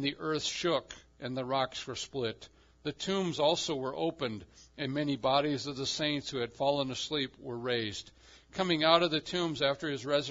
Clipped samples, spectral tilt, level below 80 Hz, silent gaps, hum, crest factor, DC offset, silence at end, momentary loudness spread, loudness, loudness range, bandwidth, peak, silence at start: under 0.1%; -4 dB/octave; -64 dBFS; none; none; 24 dB; under 0.1%; 0 s; 11 LU; -32 LUFS; 3 LU; 7.8 kHz; -8 dBFS; 0 s